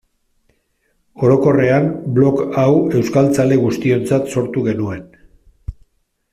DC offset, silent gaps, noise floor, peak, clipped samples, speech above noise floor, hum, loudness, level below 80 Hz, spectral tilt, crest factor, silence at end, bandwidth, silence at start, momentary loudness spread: under 0.1%; none; -64 dBFS; -2 dBFS; under 0.1%; 50 dB; none; -15 LUFS; -44 dBFS; -8 dB/octave; 14 dB; 0.6 s; 14.5 kHz; 1.15 s; 16 LU